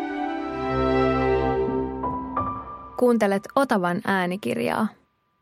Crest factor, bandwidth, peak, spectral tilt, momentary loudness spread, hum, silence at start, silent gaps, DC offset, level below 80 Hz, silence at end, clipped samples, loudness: 18 dB; 16 kHz; -6 dBFS; -6.5 dB/octave; 8 LU; none; 0 s; none; under 0.1%; -42 dBFS; 0.5 s; under 0.1%; -24 LUFS